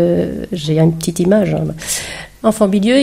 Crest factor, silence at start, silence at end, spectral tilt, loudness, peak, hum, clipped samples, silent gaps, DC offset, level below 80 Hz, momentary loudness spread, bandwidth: 14 dB; 0 s; 0 s; -5.5 dB/octave; -15 LUFS; 0 dBFS; none; under 0.1%; none; under 0.1%; -42 dBFS; 7 LU; 16 kHz